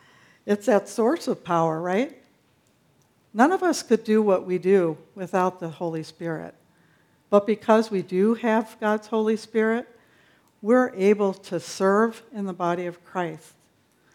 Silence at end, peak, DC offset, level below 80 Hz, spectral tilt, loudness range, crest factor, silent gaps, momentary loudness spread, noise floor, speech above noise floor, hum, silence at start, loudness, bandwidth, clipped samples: 0.75 s; -4 dBFS; under 0.1%; -76 dBFS; -6 dB/octave; 3 LU; 20 dB; none; 12 LU; -63 dBFS; 40 dB; none; 0.45 s; -24 LUFS; 15 kHz; under 0.1%